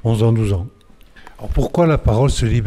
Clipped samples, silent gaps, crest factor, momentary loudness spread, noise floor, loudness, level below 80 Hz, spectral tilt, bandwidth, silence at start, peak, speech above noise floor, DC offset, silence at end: under 0.1%; none; 14 dB; 11 LU; -44 dBFS; -17 LUFS; -26 dBFS; -7 dB/octave; 12.5 kHz; 0.05 s; -2 dBFS; 28 dB; under 0.1%; 0 s